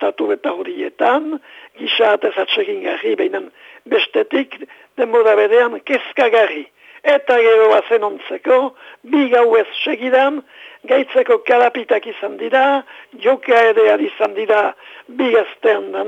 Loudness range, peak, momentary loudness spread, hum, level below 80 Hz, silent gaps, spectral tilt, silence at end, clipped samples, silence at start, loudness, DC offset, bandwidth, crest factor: 4 LU; -4 dBFS; 12 LU; none; -72 dBFS; none; -4 dB/octave; 0 s; under 0.1%; 0 s; -15 LUFS; under 0.1%; 7.6 kHz; 12 dB